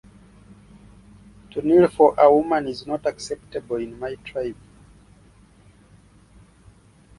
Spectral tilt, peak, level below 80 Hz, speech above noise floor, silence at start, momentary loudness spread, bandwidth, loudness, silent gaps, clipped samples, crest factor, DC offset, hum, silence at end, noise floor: -6.5 dB/octave; -2 dBFS; -54 dBFS; 32 dB; 1.55 s; 17 LU; 11.5 kHz; -21 LUFS; none; under 0.1%; 22 dB; under 0.1%; none; 2.65 s; -52 dBFS